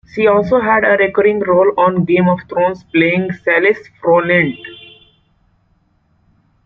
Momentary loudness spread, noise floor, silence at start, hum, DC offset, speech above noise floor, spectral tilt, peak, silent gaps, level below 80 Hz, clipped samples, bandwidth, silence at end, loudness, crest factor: 6 LU; -58 dBFS; 0.15 s; none; under 0.1%; 45 dB; -8.5 dB/octave; -2 dBFS; none; -52 dBFS; under 0.1%; 6 kHz; 1.9 s; -13 LUFS; 14 dB